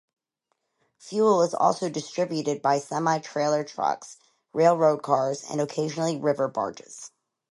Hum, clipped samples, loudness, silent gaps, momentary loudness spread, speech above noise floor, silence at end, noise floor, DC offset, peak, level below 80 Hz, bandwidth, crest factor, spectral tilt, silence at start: none; under 0.1%; -25 LUFS; none; 13 LU; 53 dB; 0.45 s; -78 dBFS; under 0.1%; -6 dBFS; -76 dBFS; 11.5 kHz; 20 dB; -5 dB/octave; 1.05 s